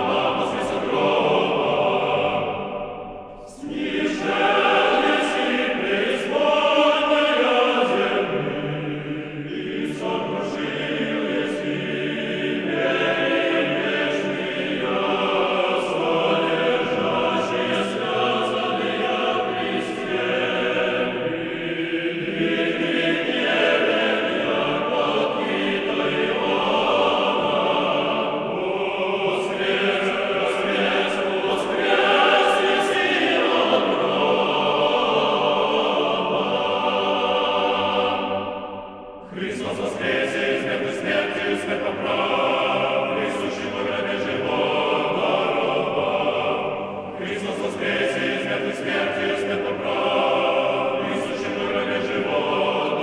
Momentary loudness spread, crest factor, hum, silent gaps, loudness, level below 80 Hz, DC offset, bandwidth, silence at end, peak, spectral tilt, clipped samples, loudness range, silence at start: 8 LU; 18 dB; none; none; -21 LUFS; -58 dBFS; under 0.1%; 11 kHz; 0 s; -4 dBFS; -5 dB/octave; under 0.1%; 5 LU; 0 s